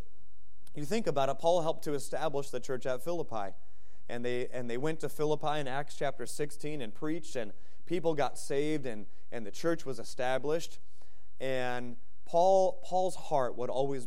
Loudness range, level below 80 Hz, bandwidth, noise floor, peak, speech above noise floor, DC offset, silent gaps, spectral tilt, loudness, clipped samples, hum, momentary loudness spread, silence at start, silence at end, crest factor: 5 LU; -64 dBFS; 15.5 kHz; -66 dBFS; -14 dBFS; 32 dB; 3%; none; -5 dB/octave; -34 LUFS; under 0.1%; none; 12 LU; 0.75 s; 0 s; 18 dB